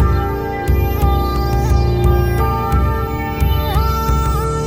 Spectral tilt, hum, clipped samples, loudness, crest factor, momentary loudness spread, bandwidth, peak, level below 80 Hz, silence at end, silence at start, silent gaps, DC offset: -7 dB/octave; none; under 0.1%; -17 LUFS; 14 dB; 4 LU; 16 kHz; -2 dBFS; -18 dBFS; 0 s; 0 s; none; under 0.1%